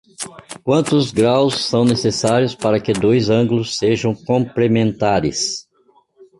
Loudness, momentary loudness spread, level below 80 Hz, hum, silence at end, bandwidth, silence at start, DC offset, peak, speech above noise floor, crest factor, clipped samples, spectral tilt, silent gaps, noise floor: -17 LUFS; 7 LU; -48 dBFS; none; 0.8 s; 11.5 kHz; 0.2 s; under 0.1%; -2 dBFS; 40 dB; 14 dB; under 0.1%; -5.5 dB/octave; none; -56 dBFS